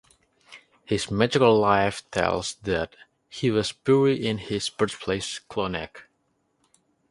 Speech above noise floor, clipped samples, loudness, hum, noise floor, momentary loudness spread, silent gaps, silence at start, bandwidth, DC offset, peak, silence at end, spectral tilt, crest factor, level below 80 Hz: 47 dB; under 0.1%; -24 LUFS; none; -71 dBFS; 11 LU; none; 0.5 s; 11.5 kHz; under 0.1%; -4 dBFS; 1.1 s; -5 dB/octave; 22 dB; -52 dBFS